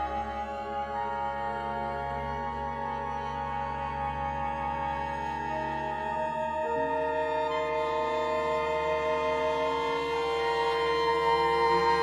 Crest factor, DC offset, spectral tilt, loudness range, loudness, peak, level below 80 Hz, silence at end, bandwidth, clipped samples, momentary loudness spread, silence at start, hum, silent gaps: 16 dB; under 0.1%; -5 dB/octave; 5 LU; -30 LUFS; -14 dBFS; -48 dBFS; 0 s; 12.5 kHz; under 0.1%; 8 LU; 0 s; none; none